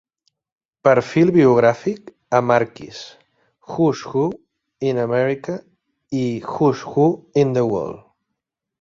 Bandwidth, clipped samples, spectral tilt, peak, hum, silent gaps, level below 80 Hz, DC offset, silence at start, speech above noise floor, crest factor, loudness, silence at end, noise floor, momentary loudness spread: 7.6 kHz; under 0.1%; -7.5 dB/octave; -2 dBFS; none; none; -58 dBFS; under 0.1%; 0.85 s; 62 dB; 18 dB; -19 LUFS; 0.85 s; -80 dBFS; 18 LU